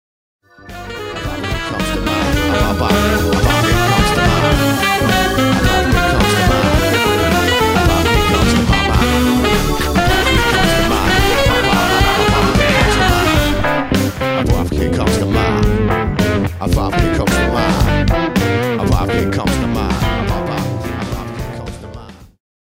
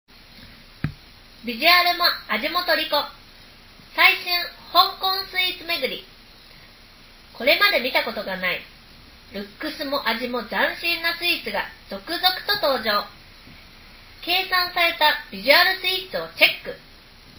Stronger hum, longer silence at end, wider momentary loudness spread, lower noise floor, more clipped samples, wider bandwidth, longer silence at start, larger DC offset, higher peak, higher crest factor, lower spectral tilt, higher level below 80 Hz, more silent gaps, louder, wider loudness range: neither; first, 0.4 s vs 0.1 s; second, 8 LU vs 17 LU; second, -34 dBFS vs -48 dBFS; neither; second, 16.5 kHz vs over 20 kHz; first, 0.65 s vs 0.35 s; neither; about the same, 0 dBFS vs 0 dBFS; second, 14 dB vs 24 dB; first, -5 dB/octave vs -2.5 dB/octave; first, -22 dBFS vs -52 dBFS; neither; first, -14 LUFS vs -20 LUFS; about the same, 4 LU vs 5 LU